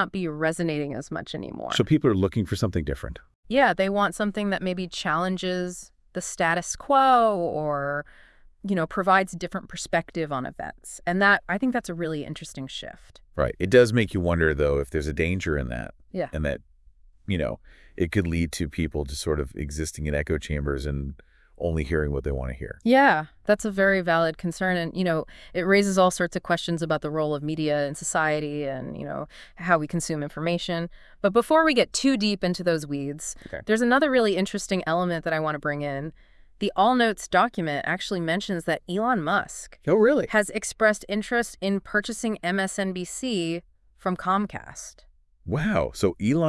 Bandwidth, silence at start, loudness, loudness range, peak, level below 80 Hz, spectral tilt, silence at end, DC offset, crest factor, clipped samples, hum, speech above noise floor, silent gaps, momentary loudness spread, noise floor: 12 kHz; 0 s; -25 LUFS; 6 LU; -4 dBFS; -44 dBFS; -5 dB/octave; 0 s; under 0.1%; 20 dB; under 0.1%; none; 29 dB; 3.35-3.43 s; 14 LU; -54 dBFS